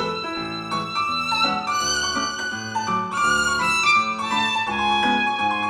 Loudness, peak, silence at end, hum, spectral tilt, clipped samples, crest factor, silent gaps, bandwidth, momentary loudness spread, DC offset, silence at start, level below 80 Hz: -21 LUFS; -6 dBFS; 0 s; none; -2 dB/octave; under 0.1%; 16 dB; none; 15.5 kHz; 9 LU; under 0.1%; 0 s; -50 dBFS